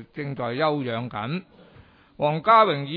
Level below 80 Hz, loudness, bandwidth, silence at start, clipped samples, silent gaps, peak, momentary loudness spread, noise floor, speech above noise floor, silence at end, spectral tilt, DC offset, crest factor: -64 dBFS; -23 LUFS; 5.2 kHz; 0 s; under 0.1%; none; -4 dBFS; 14 LU; -52 dBFS; 29 dB; 0 s; -9 dB/octave; under 0.1%; 20 dB